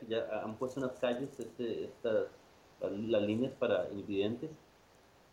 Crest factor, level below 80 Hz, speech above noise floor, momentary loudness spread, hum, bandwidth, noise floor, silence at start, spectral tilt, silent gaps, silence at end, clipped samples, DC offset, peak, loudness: 18 dB; -72 dBFS; 28 dB; 9 LU; none; 15.5 kHz; -63 dBFS; 0 s; -6.5 dB/octave; none; 0.75 s; under 0.1%; under 0.1%; -20 dBFS; -37 LUFS